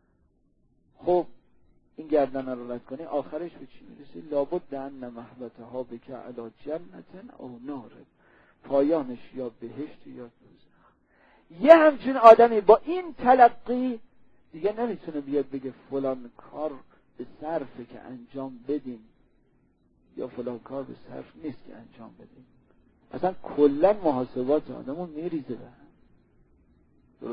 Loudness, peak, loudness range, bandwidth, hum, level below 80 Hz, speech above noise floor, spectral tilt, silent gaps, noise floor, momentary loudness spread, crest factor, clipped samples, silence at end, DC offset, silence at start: -24 LUFS; -2 dBFS; 20 LU; 6.6 kHz; none; -60 dBFS; 41 dB; -7.5 dB/octave; none; -66 dBFS; 25 LU; 26 dB; under 0.1%; 0 s; under 0.1%; 1.05 s